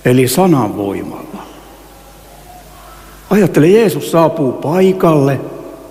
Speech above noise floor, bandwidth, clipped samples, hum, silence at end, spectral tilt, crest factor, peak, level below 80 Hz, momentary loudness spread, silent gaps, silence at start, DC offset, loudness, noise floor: 27 dB; 16 kHz; under 0.1%; none; 0.05 s; -6.5 dB/octave; 14 dB; 0 dBFS; -44 dBFS; 19 LU; none; 0.05 s; under 0.1%; -12 LUFS; -38 dBFS